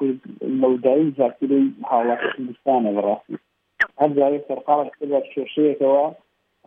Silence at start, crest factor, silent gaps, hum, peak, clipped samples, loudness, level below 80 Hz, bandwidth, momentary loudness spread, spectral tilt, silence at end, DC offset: 0 s; 16 dB; none; none; -4 dBFS; under 0.1%; -21 LUFS; -70 dBFS; 5.8 kHz; 8 LU; -8.5 dB/octave; 0.55 s; under 0.1%